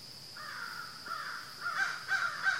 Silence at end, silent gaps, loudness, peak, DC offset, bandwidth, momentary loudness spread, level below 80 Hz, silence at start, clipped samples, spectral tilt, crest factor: 0 s; none; -36 LUFS; -20 dBFS; under 0.1%; 16 kHz; 11 LU; -78 dBFS; 0 s; under 0.1%; -0.5 dB/octave; 18 dB